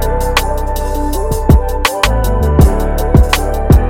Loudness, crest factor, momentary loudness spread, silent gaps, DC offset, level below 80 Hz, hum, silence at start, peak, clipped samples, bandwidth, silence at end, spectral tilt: -13 LUFS; 10 dB; 7 LU; none; under 0.1%; -14 dBFS; none; 0 s; 0 dBFS; under 0.1%; 17 kHz; 0 s; -5.5 dB/octave